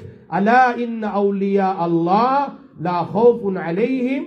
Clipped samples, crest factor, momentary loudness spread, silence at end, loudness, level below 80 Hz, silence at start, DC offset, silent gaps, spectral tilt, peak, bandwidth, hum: under 0.1%; 16 dB; 9 LU; 0 s; -18 LUFS; -66 dBFS; 0 s; under 0.1%; none; -8.5 dB/octave; -2 dBFS; 6.6 kHz; none